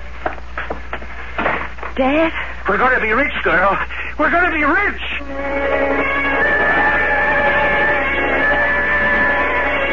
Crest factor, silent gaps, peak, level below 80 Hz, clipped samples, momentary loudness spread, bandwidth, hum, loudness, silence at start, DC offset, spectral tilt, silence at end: 14 dB; none; -4 dBFS; -34 dBFS; under 0.1%; 12 LU; 7.4 kHz; none; -15 LUFS; 0 s; 4%; -6 dB/octave; 0 s